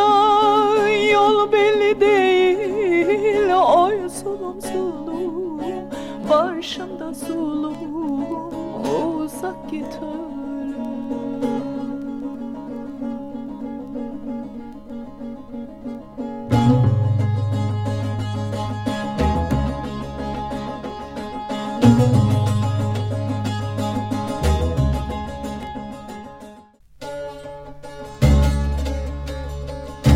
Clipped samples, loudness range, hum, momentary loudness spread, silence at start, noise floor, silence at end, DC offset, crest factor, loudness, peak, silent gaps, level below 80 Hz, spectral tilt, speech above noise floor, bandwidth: under 0.1%; 12 LU; none; 17 LU; 0 s; -46 dBFS; 0 s; under 0.1%; 20 dB; -21 LUFS; 0 dBFS; none; -32 dBFS; -7 dB/octave; 21 dB; 15.5 kHz